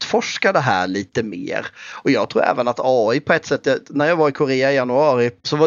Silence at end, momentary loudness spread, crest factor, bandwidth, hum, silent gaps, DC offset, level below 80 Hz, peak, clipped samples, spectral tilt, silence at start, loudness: 0 s; 8 LU; 18 dB; 7.4 kHz; none; none; under 0.1%; -62 dBFS; 0 dBFS; under 0.1%; -5 dB/octave; 0 s; -18 LUFS